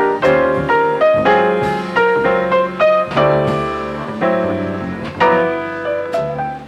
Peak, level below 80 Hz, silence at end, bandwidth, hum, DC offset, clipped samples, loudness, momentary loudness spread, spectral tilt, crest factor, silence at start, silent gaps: -4 dBFS; -44 dBFS; 0 s; 11 kHz; none; under 0.1%; under 0.1%; -15 LUFS; 8 LU; -7 dB/octave; 12 dB; 0 s; none